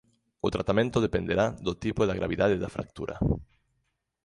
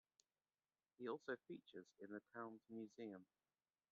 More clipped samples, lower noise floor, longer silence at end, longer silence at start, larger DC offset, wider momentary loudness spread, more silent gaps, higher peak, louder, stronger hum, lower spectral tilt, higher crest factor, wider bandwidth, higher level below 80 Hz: neither; second, -77 dBFS vs under -90 dBFS; about the same, 0.8 s vs 0.7 s; second, 0.45 s vs 1 s; neither; about the same, 8 LU vs 8 LU; neither; first, -10 dBFS vs -36 dBFS; first, -28 LUFS vs -55 LUFS; neither; first, -7 dB/octave vs -4.5 dB/octave; about the same, 20 dB vs 20 dB; first, 11 kHz vs 7.2 kHz; first, -44 dBFS vs under -90 dBFS